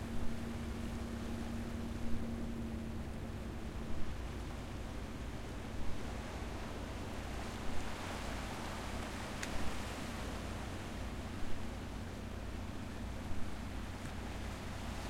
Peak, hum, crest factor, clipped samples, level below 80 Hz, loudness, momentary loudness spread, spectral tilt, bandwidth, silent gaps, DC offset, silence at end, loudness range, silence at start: -22 dBFS; none; 18 dB; under 0.1%; -46 dBFS; -44 LUFS; 3 LU; -5.5 dB/octave; 16 kHz; none; under 0.1%; 0 s; 2 LU; 0 s